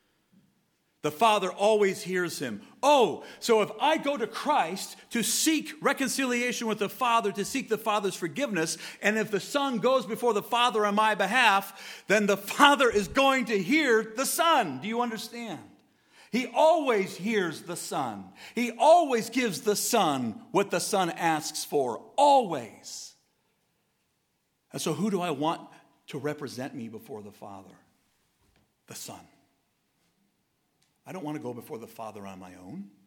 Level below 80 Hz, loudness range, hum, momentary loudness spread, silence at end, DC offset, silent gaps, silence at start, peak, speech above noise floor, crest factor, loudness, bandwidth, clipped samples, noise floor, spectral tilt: -68 dBFS; 17 LU; none; 19 LU; 0.2 s; under 0.1%; none; 1.05 s; -4 dBFS; 48 dB; 24 dB; -26 LUFS; 19.5 kHz; under 0.1%; -75 dBFS; -3.5 dB/octave